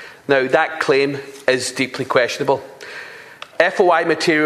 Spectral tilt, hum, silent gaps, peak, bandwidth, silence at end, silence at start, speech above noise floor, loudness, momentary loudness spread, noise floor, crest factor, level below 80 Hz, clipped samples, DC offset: -4 dB/octave; none; none; 0 dBFS; 14 kHz; 0 s; 0 s; 21 dB; -17 LUFS; 18 LU; -38 dBFS; 18 dB; -64 dBFS; under 0.1%; under 0.1%